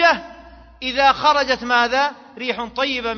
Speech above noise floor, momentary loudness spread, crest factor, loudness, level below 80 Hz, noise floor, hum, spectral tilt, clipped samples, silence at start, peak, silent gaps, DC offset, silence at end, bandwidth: 24 dB; 10 LU; 18 dB; -19 LUFS; -48 dBFS; -43 dBFS; none; -2.5 dB/octave; under 0.1%; 0 s; -2 dBFS; none; under 0.1%; 0 s; 6.8 kHz